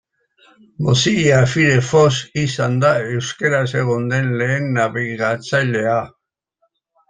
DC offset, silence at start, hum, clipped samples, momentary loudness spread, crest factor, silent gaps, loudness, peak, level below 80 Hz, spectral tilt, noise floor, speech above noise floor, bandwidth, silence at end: under 0.1%; 0.8 s; none; under 0.1%; 7 LU; 16 dB; none; -17 LUFS; -2 dBFS; -52 dBFS; -5.5 dB/octave; -68 dBFS; 51 dB; 9.6 kHz; 1 s